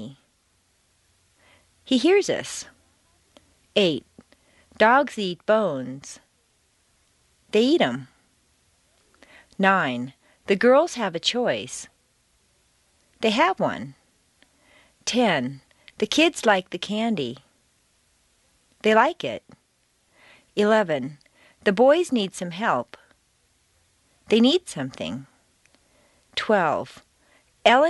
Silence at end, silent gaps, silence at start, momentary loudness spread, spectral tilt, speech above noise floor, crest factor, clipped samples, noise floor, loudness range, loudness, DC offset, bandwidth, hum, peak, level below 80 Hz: 0 s; none; 0 s; 18 LU; -4 dB/octave; 45 dB; 22 dB; under 0.1%; -67 dBFS; 4 LU; -22 LUFS; under 0.1%; 11.5 kHz; none; -2 dBFS; -66 dBFS